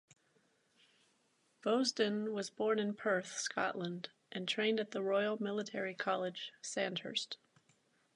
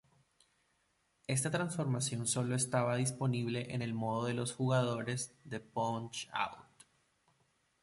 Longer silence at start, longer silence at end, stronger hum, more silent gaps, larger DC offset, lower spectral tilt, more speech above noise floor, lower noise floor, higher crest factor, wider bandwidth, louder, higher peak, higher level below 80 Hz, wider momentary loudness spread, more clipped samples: first, 1.65 s vs 1.3 s; second, 0.8 s vs 1.2 s; neither; neither; neither; about the same, -3.5 dB/octave vs -4.5 dB/octave; about the same, 39 dB vs 42 dB; about the same, -76 dBFS vs -77 dBFS; about the same, 20 dB vs 18 dB; about the same, 11 kHz vs 12 kHz; about the same, -37 LUFS vs -36 LUFS; about the same, -20 dBFS vs -18 dBFS; second, -90 dBFS vs -72 dBFS; about the same, 9 LU vs 8 LU; neither